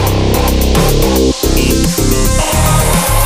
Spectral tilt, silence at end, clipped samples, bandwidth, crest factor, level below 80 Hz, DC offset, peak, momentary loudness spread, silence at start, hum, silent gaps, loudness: -4.5 dB/octave; 0 s; under 0.1%; 16.5 kHz; 10 dB; -14 dBFS; under 0.1%; 0 dBFS; 2 LU; 0 s; none; none; -11 LUFS